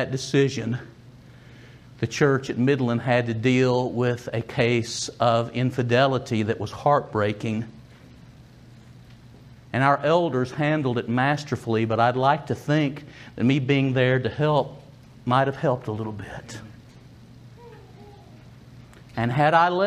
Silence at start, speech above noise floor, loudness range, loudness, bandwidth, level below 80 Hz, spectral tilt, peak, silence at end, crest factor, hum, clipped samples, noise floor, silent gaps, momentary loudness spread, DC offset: 0 s; 25 dB; 6 LU; -23 LUFS; 11.5 kHz; -58 dBFS; -6 dB/octave; -4 dBFS; 0 s; 20 dB; none; under 0.1%; -48 dBFS; none; 11 LU; under 0.1%